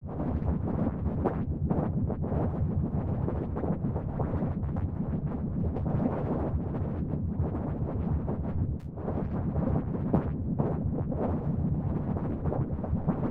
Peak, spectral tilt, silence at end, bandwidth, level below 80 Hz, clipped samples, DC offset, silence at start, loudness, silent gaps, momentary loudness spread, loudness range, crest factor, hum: -12 dBFS; -12.5 dB/octave; 0 s; 3.5 kHz; -38 dBFS; under 0.1%; under 0.1%; 0 s; -31 LUFS; none; 3 LU; 1 LU; 18 dB; none